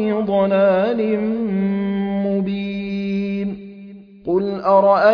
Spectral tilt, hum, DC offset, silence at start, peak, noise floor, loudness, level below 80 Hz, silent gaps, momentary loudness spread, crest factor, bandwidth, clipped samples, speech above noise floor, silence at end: -9.5 dB/octave; none; under 0.1%; 0 s; -4 dBFS; -39 dBFS; -19 LUFS; -54 dBFS; none; 11 LU; 14 dB; 5.4 kHz; under 0.1%; 22 dB; 0 s